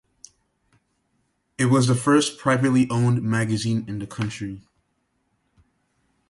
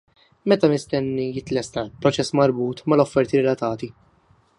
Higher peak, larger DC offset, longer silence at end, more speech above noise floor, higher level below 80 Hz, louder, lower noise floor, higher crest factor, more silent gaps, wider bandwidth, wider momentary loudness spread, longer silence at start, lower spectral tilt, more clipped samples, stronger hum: second, -6 dBFS vs -2 dBFS; neither; first, 1.7 s vs 0.7 s; first, 50 dB vs 38 dB; about the same, -58 dBFS vs -56 dBFS; about the same, -22 LUFS vs -21 LUFS; first, -71 dBFS vs -59 dBFS; about the same, 18 dB vs 20 dB; neither; about the same, 11.5 kHz vs 11.5 kHz; first, 14 LU vs 9 LU; first, 1.6 s vs 0.45 s; about the same, -5.5 dB/octave vs -6 dB/octave; neither; neither